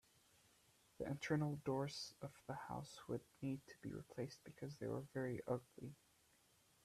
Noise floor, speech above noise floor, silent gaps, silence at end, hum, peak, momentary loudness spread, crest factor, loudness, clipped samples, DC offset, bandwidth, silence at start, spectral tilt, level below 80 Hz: -75 dBFS; 28 dB; none; 0.9 s; none; -28 dBFS; 12 LU; 20 dB; -48 LUFS; under 0.1%; under 0.1%; 14.5 kHz; 1 s; -6 dB/octave; -76 dBFS